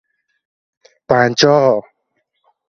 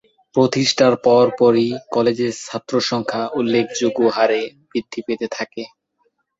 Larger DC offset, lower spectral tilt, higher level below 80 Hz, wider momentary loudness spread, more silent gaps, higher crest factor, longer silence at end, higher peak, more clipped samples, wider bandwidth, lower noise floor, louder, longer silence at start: neither; about the same, -4.5 dB/octave vs -4.5 dB/octave; about the same, -56 dBFS vs -60 dBFS; second, 6 LU vs 12 LU; neither; about the same, 18 dB vs 16 dB; first, 0.9 s vs 0.7 s; about the same, 0 dBFS vs -2 dBFS; neither; about the same, 7.6 kHz vs 8 kHz; about the same, -69 dBFS vs -67 dBFS; first, -13 LUFS vs -18 LUFS; first, 1.1 s vs 0.35 s